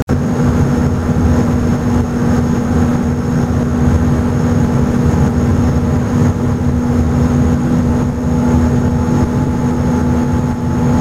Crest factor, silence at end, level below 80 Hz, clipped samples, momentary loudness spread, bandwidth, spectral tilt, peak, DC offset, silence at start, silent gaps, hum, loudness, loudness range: 12 dB; 0 s; -22 dBFS; under 0.1%; 3 LU; 14 kHz; -8 dB/octave; 0 dBFS; under 0.1%; 0 s; 0.02-0.07 s; none; -14 LUFS; 1 LU